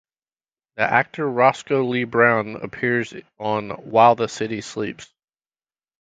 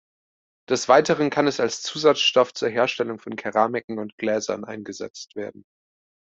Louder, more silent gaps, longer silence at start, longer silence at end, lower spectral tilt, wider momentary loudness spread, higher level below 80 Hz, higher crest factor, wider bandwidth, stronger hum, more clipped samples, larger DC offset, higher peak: about the same, -20 LUFS vs -22 LUFS; second, none vs 3.84-3.88 s, 4.12-4.18 s, 5.10-5.14 s; about the same, 0.75 s vs 0.7 s; first, 0.95 s vs 0.8 s; first, -5.5 dB/octave vs -3.5 dB/octave; second, 14 LU vs 17 LU; first, -62 dBFS vs -68 dBFS; about the same, 22 dB vs 20 dB; first, 9.2 kHz vs 8.2 kHz; neither; neither; neither; about the same, 0 dBFS vs -2 dBFS